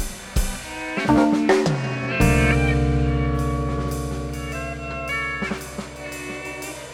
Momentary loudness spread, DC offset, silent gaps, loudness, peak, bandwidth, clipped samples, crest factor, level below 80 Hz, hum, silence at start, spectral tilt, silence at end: 13 LU; under 0.1%; none; -23 LUFS; -4 dBFS; 17 kHz; under 0.1%; 18 dB; -30 dBFS; none; 0 s; -6 dB/octave; 0 s